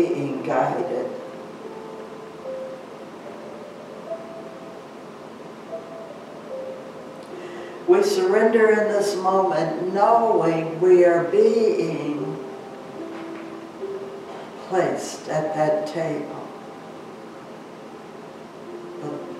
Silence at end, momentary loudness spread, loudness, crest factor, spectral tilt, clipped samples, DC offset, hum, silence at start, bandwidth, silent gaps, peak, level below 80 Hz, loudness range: 0 s; 21 LU; -22 LUFS; 20 dB; -6 dB/octave; under 0.1%; under 0.1%; none; 0 s; 13.5 kHz; none; -4 dBFS; -76 dBFS; 18 LU